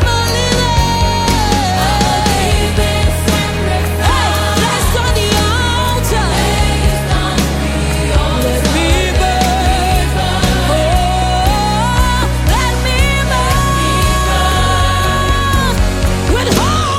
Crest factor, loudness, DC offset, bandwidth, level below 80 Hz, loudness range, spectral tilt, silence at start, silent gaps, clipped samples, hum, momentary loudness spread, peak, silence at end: 12 dB; -13 LUFS; under 0.1%; 16.5 kHz; -18 dBFS; 1 LU; -4.5 dB/octave; 0 s; none; under 0.1%; none; 2 LU; 0 dBFS; 0 s